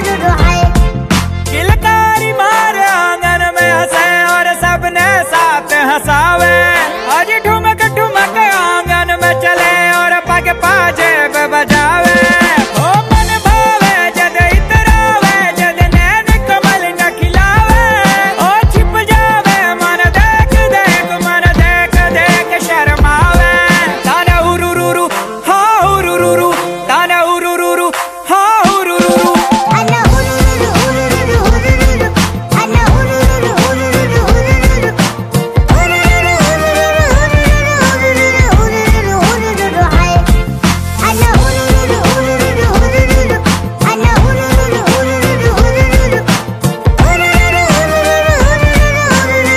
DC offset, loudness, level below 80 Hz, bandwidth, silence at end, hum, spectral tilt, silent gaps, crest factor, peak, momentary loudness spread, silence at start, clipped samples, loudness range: under 0.1%; -9 LUFS; -16 dBFS; 16 kHz; 0 s; none; -4.5 dB/octave; none; 8 dB; 0 dBFS; 4 LU; 0 s; 0.5%; 2 LU